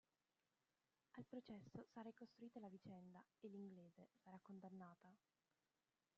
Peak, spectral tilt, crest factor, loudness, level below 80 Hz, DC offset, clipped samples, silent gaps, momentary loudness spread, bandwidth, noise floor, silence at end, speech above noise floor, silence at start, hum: -44 dBFS; -7 dB/octave; 18 dB; -62 LUFS; under -90 dBFS; under 0.1%; under 0.1%; none; 8 LU; 7 kHz; under -90 dBFS; 1 s; over 29 dB; 1.15 s; none